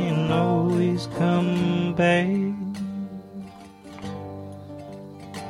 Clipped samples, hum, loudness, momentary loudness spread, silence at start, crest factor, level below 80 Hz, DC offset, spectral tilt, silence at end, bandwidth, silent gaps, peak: under 0.1%; none; -23 LUFS; 19 LU; 0 s; 16 dB; -56 dBFS; under 0.1%; -7.5 dB/octave; 0 s; 11 kHz; none; -8 dBFS